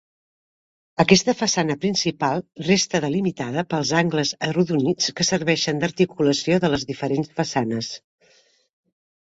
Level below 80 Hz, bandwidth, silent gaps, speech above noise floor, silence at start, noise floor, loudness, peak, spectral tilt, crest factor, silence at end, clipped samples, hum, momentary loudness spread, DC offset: -56 dBFS; 8 kHz; none; 38 dB; 1 s; -59 dBFS; -21 LUFS; 0 dBFS; -4.5 dB/octave; 22 dB; 1.4 s; under 0.1%; none; 7 LU; under 0.1%